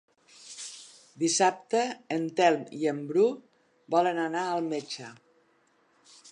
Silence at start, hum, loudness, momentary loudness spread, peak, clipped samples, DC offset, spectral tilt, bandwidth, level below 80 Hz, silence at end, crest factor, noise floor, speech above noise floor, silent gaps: 0.4 s; none; -28 LUFS; 17 LU; -8 dBFS; under 0.1%; under 0.1%; -3.5 dB/octave; 11 kHz; -86 dBFS; 0.05 s; 20 dB; -67 dBFS; 40 dB; none